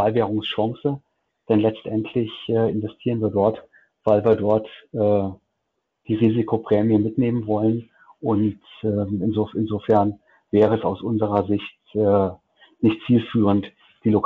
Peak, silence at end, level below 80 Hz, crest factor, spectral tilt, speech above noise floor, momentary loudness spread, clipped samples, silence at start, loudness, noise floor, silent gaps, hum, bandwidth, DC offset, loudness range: -6 dBFS; 0 s; -56 dBFS; 14 dB; -10 dB/octave; 56 dB; 9 LU; under 0.1%; 0 s; -22 LUFS; -76 dBFS; none; none; 4.3 kHz; under 0.1%; 2 LU